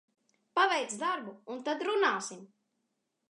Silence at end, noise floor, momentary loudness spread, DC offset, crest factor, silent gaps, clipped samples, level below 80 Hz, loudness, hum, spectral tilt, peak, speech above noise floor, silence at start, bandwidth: 0.85 s; -82 dBFS; 14 LU; under 0.1%; 20 dB; none; under 0.1%; under -90 dBFS; -31 LUFS; none; -2 dB/octave; -14 dBFS; 50 dB; 0.55 s; 11 kHz